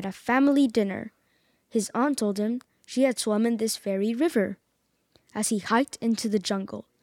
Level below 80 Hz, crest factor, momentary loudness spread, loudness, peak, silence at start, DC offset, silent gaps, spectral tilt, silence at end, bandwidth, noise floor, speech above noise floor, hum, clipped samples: -70 dBFS; 16 dB; 11 LU; -26 LUFS; -10 dBFS; 0 s; under 0.1%; none; -4.5 dB/octave; 0.2 s; 17 kHz; -73 dBFS; 47 dB; none; under 0.1%